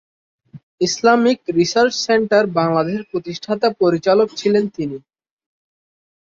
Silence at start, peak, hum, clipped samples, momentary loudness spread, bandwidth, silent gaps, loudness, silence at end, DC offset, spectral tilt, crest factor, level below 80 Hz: 0.55 s; -2 dBFS; none; under 0.1%; 11 LU; 7.6 kHz; 0.63-0.78 s; -17 LUFS; 1.25 s; under 0.1%; -4.5 dB/octave; 16 dB; -60 dBFS